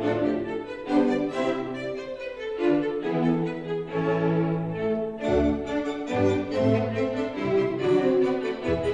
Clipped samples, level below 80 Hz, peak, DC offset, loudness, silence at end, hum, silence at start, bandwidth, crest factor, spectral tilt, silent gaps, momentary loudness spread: under 0.1%; -48 dBFS; -10 dBFS; under 0.1%; -26 LUFS; 0 s; none; 0 s; 9.6 kHz; 16 dB; -7.5 dB/octave; none; 8 LU